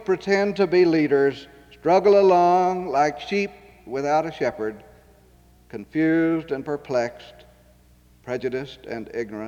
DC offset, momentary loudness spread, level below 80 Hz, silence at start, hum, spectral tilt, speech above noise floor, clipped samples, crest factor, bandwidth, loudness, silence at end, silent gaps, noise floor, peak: under 0.1%; 15 LU; -56 dBFS; 0 s; none; -6.5 dB/octave; 33 dB; under 0.1%; 16 dB; 7.8 kHz; -22 LUFS; 0 s; none; -54 dBFS; -6 dBFS